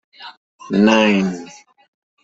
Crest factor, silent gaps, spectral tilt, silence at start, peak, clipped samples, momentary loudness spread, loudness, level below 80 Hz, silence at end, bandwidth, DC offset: 18 dB; 0.37-0.58 s; -5.5 dB/octave; 0.2 s; -2 dBFS; under 0.1%; 25 LU; -15 LUFS; -58 dBFS; 0.75 s; 7.8 kHz; under 0.1%